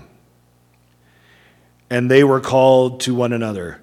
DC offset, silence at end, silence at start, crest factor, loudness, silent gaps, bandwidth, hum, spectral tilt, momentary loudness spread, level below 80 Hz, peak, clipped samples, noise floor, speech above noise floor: under 0.1%; 0.05 s; 1.9 s; 18 dB; -16 LUFS; none; 14.5 kHz; 60 Hz at -45 dBFS; -6 dB/octave; 10 LU; -56 dBFS; 0 dBFS; under 0.1%; -56 dBFS; 41 dB